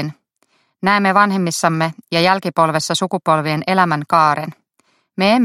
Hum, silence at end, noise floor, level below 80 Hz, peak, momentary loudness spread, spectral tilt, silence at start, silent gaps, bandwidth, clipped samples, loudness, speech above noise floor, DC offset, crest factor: none; 0 s; -62 dBFS; -62 dBFS; 0 dBFS; 8 LU; -4.5 dB/octave; 0 s; none; 14.5 kHz; under 0.1%; -16 LUFS; 47 dB; under 0.1%; 16 dB